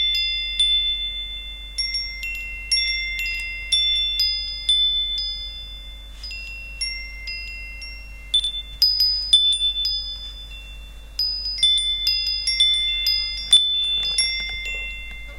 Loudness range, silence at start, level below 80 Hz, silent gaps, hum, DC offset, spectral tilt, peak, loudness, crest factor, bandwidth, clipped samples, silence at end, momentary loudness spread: 6 LU; 0 s; -38 dBFS; none; none; under 0.1%; 1 dB/octave; -4 dBFS; -19 LUFS; 20 dB; 17 kHz; under 0.1%; 0 s; 18 LU